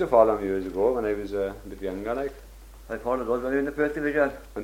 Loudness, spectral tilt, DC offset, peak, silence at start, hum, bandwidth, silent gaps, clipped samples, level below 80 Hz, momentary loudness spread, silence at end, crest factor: -27 LUFS; -7 dB/octave; under 0.1%; -6 dBFS; 0 s; none; 16.5 kHz; none; under 0.1%; -46 dBFS; 11 LU; 0 s; 20 dB